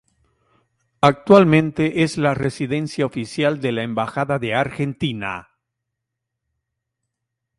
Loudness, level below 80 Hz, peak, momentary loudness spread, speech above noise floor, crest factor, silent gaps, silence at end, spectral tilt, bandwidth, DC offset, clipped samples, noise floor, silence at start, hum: -19 LUFS; -54 dBFS; 0 dBFS; 11 LU; 62 dB; 20 dB; none; 2.2 s; -6.5 dB/octave; 11.5 kHz; under 0.1%; under 0.1%; -81 dBFS; 1 s; none